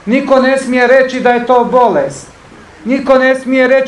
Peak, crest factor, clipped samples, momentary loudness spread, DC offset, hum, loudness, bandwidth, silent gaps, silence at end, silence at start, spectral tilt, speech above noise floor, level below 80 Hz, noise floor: 0 dBFS; 10 dB; 0.4%; 8 LU; under 0.1%; none; -10 LUFS; 11 kHz; none; 0 s; 0.05 s; -5 dB/octave; 27 dB; -48 dBFS; -36 dBFS